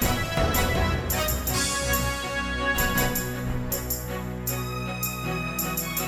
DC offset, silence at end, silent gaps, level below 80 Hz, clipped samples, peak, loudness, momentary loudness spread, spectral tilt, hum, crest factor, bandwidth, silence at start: under 0.1%; 0 s; none; -34 dBFS; under 0.1%; -10 dBFS; -26 LUFS; 6 LU; -3.5 dB/octave; none; 16 dB; 19 kHz; 0 s